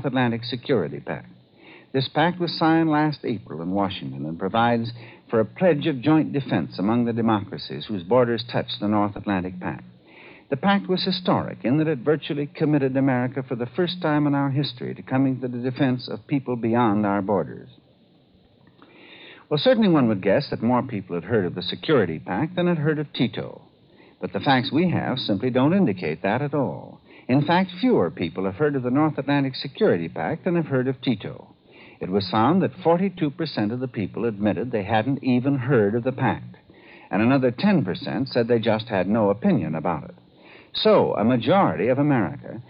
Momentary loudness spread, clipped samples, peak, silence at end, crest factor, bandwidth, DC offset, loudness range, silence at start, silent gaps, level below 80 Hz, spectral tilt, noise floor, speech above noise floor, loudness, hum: 10 LU; under 0.1%; -6 dBFS; 0.1 s; 16 dB; 5.4 kHz; under 0.1%; 3 LU; 0 s; none; -62 dBFS; -11 dB/octave; -57 dBFS; 35 dB; -23 LUFS; none